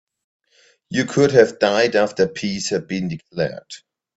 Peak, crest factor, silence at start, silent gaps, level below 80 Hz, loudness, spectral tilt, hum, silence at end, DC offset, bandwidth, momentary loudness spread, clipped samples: 0 dBFS; 20 dB; 0.9 s; none; -58 dBFS; -19 LUFS; -5 dB/octave; none; 0.4 s; under 0.1%; 8 kHz; 13 LU; under 0.1%